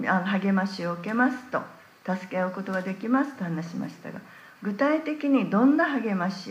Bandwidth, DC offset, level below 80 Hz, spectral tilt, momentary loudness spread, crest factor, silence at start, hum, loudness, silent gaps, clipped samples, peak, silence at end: 15 kHz; under 0.1%; -78 dBFS; -7 dB/octave; 14 LU; 16 dB; 0 s; none; -26 LUFS; none; under 0.1%; -10 dBFS; 0 s